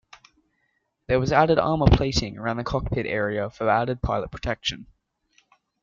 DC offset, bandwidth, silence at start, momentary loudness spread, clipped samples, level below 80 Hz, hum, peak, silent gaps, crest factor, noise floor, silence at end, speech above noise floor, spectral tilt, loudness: under 0.1%; 7.6 kHz; 1.1 s; 9 LU; under 0.1%; -36 dBFS; none; -2 dBFS; none; 22 dB; -73 dBFS; 1 s; 50 dB; -6 dB/octave; -24 LUFS